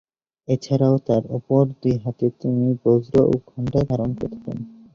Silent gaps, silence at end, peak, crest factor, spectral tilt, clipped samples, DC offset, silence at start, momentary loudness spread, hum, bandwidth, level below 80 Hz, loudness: none; 0.25 s; -4 dBFS; 18 dB; -9.5 dB/octave; under 0.1%; under 0.1%; 0.5 s; 11 LU; none; 7.2 kHz; -48 dBFS; -21 LUFS